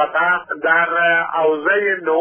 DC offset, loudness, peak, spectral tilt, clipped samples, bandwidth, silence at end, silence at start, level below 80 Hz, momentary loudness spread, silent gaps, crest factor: under 0.1%; -16 LUFS; -4 dBFS; -7 dB/octave; under 0.1%; 3.5 kHz; 0 s; 0 s; -74 dBFS; 3 LU; none; 12 dB